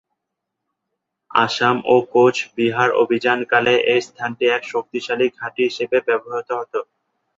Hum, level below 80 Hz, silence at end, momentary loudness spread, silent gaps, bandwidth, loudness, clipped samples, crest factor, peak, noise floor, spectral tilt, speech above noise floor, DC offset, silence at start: none; -64 dBFS; 0.55 s; 9 LU; none; 7.8 kHz; -19 LUFS; under 0.1%; 18 dB; -2 dBFS; -80 dBFS; -4.5 dB/octave; 62 dB; under 0.1%; 1.35 s